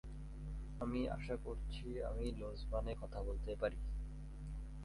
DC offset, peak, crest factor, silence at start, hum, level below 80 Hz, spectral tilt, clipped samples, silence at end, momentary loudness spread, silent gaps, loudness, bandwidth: under 0.1%; -26 dBFS; 18 dB; 0.05 s; none; -46 dBFS; -7.5 dB/octave; under 0.1%; 0 s; 9 LU; none; -45 LUFS; 11.5 kHz